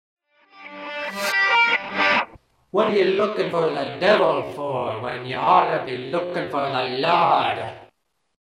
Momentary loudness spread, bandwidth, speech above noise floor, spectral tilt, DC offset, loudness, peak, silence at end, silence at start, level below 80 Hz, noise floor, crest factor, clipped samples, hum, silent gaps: 12 LU; 16 kHz; 45 dB; -4.5 dB/octave; under 0.1%; -21 LUFS; -4 dBFS; 0.55 s; 0.55 s; -64 dBFS; -65 dBFS; 18 dB; under 0.1%; none; none